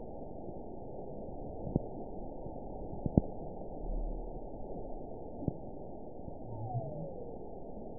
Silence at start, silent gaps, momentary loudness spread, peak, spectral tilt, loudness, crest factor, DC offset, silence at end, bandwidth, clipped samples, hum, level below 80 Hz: 0 s; none; 10 LU; -10 dBFS; -5.5 dB/octave; -42 LUFS; 30 dB; 0.4%; 0 s; 1 kHz; under 0.1%; none; -46 dBFS